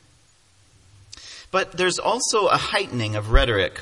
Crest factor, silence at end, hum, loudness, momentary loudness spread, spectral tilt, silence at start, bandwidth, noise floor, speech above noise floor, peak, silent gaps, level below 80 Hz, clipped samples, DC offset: 22 dB; 0 s; none; -21 LUFS; 13 LU; -3.5 dB/octave; 1.15 s; 11.5 kHz; -58 dBFS; 37 dB; -2 dBFS; none; -30 dBFS; under 0.1%; under 0.1%